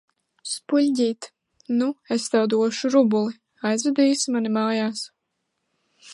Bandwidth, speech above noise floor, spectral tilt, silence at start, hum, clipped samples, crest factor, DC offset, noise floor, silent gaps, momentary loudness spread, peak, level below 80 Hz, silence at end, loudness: 11.5 kHz; 56 dB; -4 dB/octave; 0.45 s; none; under 0.1%; 16 dB; under 0.1%; -77 dBFS; none; 12 LU; -8 dBFS; -78 dBFS; 0 s; -22 LUFS